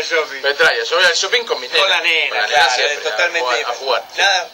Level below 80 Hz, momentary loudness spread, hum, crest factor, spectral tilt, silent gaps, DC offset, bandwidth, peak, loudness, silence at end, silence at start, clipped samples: -62 dBFS; 6 LU; none; 14 dB; 1 dB/octave; none; under 0.1%; 17 kHz; -4 dBFS; -15 LUFS; 0 s; 0 s; under 0.1%